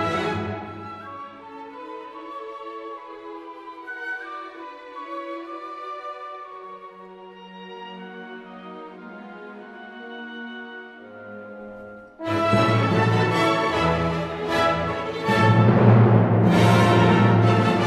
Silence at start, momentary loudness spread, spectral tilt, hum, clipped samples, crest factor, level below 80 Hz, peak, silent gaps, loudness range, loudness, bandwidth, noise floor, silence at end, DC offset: 0 s; 23 LU; -7 dB/octave; none; under 0.1%; 20 dB; -52 dBFS; -4 dBFS; none; 20 LU; -19 LUFS; 12.5 kHz; -42 dBFS; 0 s; under 0.1%